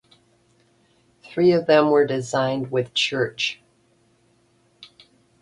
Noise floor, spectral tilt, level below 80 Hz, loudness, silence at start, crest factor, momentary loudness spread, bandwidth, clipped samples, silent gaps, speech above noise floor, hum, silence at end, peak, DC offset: -62 dBFS; -5 dB/octave; -64 dBFS; -21 LUFS; 1.3 s; 20 dB; 10 LU; 11.5 kHz; under 0.1%; none; 42 dB; none; 0.55 s; -4 dBFS; under 0.1%